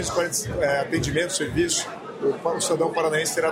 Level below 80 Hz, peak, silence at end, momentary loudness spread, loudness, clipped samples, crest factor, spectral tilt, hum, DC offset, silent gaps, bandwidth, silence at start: -46 dBFS; -10 dBFS; 0 s; 3 LU; -24 LUFS; under 0.1%; 14 dB; -3.5 dB/octave; none; under 0.1%; none; 16 kHz; 0 s